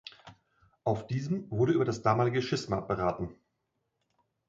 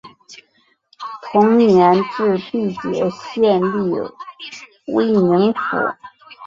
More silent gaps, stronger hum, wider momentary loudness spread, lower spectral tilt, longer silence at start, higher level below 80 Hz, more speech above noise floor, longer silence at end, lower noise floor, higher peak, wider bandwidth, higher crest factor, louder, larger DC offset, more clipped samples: neither; neither; second, 10 LU vs 21 LU; about the same, -7 dB/octave vs -7.5 dB/octave; about the same, 0.05 s vs 0.05 s; about the same, -58 dBFS vs -58 dBFS; first, 51 dB vs 44 dB; first, 1.15 s vs 0 s; first, -81 dBFS vs -60 dBFS; second, -12 dBFS vs 0 dBFS; about the same, 7.8 kHz vs 7.6 kHz; about the same, 20 dB vs 16 dB; second, -30 LUFS vs -17 LUFS; neither; neither